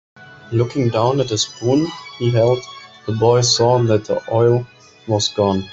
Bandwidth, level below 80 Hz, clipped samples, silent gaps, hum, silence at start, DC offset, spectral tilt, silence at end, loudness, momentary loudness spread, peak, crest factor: 8 kHz; -54 dBFS; under 0.1%; none; none; 0.2 s; under 0.1%; -5 dB/octave; 0 s; -17 LUFS; 11 LU; -2 dBFS; 14 dB